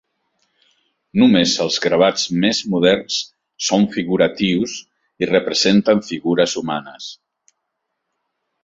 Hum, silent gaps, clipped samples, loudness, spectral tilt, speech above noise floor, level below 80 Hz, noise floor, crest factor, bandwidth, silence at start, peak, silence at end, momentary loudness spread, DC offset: none; none; under 0.1%; -17 LUFS; -4.5 dB/octave; 59 dB; -56 dBFS; -76 dBFS; 18 dB; 7.8 kHz; 1.15 s; -2 dBFS; 1.5 s; 12 LU; under 0.1%